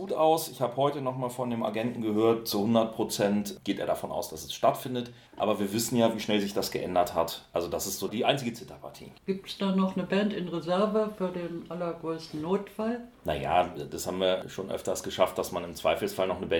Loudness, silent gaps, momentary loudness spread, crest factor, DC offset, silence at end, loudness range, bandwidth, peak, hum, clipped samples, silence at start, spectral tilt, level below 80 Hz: -29 LUFS; none; 9 LU; 22 dB; under 0.1%; 0 s; 3 LU; 18 kHz; -8 dBFS; none; under 0.1%; 0 s; -5 dB/octave; -58 dBFS